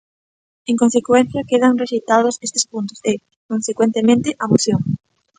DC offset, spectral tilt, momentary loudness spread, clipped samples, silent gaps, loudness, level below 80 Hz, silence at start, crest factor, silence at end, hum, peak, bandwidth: under 0.1%; -5 dB/octave; 9 LU; under 0.1%; 3.36-3.49 s; -17 LUFS; -56 dBFS; 0.7 s; 18 dB; 0.45 s; none; 0 dBFS; 9.4 kHz